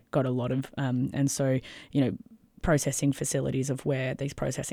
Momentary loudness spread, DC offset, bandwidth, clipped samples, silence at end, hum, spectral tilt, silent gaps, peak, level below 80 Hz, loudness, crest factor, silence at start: 6 LU; under 0.1%; 16 kHz; under 0.1%; 0 s; none; -5.5 dB/octave; none; -12 dBFS; -48 dBFS; -29 LUFS; 16 dB; 0.15 s